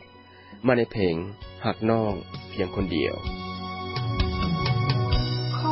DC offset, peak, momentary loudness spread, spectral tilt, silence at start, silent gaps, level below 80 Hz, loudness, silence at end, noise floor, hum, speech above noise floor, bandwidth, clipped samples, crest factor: under 0.1%; -8 dBFS; 9 LU; -10.5 dB/octave; 0 s; none; -36 dBFS; -27 LUFS; 0 s; -49 dBFS; none; 23 dB; 5.8 kHz; under 0.1%; 18 dB